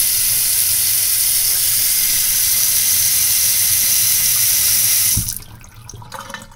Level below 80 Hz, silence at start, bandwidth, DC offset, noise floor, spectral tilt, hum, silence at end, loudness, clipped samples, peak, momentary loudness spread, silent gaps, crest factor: -42 dBFS; 0 s; 18 kHz; under 0.1%; -37 dBFS; 1 dB/octave; none; 0 s; -12 LUFS; under 0.1%; 0 dBFS; 8 LU; none; 16 dB